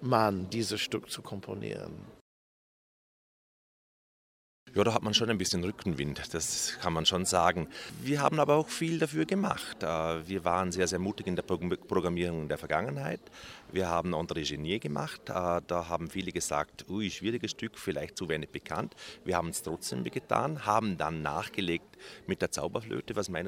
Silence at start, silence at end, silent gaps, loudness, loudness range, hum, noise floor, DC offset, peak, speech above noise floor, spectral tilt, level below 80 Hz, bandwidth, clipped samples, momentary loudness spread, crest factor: 0 s; 0 s; 2.21-4.66 s; -32 LUFS; 6 LU; none; under -90 dBFS; under 0.1%; -8 dBFS; over 58 dB; -4 dB/octave; -58 dBFS; 16 kHz; under 0.1%; 10 LU; 24 dB